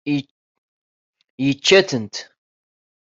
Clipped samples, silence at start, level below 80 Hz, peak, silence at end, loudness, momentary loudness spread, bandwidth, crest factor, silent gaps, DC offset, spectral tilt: under 0.1%; 0.05 s; -62 dBFS; 0 dBFS; 0.9 s; -18 LUFS; 16 LU; 7.8 kHz; 22 dB; 0.31-1.13 s, 1.30-1.38 s; under 0.1%; -4 dB/octave